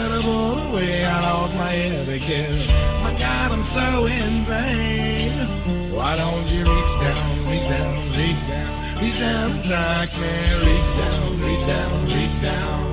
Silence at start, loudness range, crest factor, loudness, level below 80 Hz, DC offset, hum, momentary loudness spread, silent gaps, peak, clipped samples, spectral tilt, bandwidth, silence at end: 0 s; 1 LU; 16 dB; -21 LUFS; -24 dBFS; under 0.1%; none; 4 LU; none; -4 dBFS; under 0.1%; -10.5 dB/octave; 4 kHz; 0 s